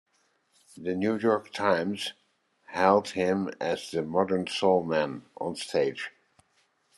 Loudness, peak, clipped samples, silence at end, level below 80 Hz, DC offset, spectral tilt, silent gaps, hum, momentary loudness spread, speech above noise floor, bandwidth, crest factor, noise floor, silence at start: -28 LUFS; -6 dBFS; under 0.1%; 0.9 s; -72 dBFS; under 0.1%; -5 dB/octave; none; none; 12 LU; 43 dB; 12.5 kHz; 22 dB; -70 dBFS; 0.75 s